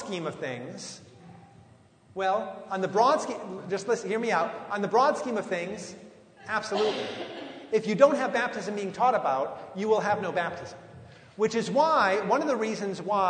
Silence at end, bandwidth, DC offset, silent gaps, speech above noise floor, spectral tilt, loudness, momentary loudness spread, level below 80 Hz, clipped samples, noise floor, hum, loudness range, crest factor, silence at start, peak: 0 s; 9.6 kHz; under 0.1%; none; 29 dB; -4.5 dB/octave; -27 LUFS; 17 LU; -72 dBFS; under 0.1%; -56 dBFS; none; 3 LU; 22 dB; 0 s; -6 dBFS